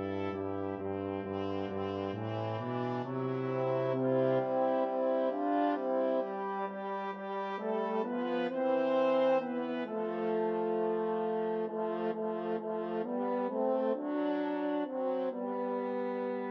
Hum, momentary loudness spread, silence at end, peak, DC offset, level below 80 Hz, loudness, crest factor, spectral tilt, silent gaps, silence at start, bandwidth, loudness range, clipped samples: none; 7 LU; 0 s; -20 dBFS; under 0.1%; -84 dBFS; -34 LUFS; 14 dB; -6 dB/octave; none; 0 s; 6 kHz; 3 LU; under 0.1%